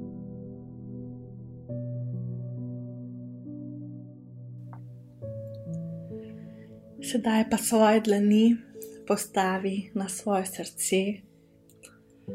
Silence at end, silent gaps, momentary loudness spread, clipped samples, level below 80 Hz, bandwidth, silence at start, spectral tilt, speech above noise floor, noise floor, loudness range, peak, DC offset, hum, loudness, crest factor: 0 s; none; 22 LU; under 0.1%; -66 dBFS; 16 kHz; 0 s; -5 dB/octave; 33 dB; -58 dBFS; 16 LU; -10 dBFS; under 0.1%; none; -27 LUFS; 20 dB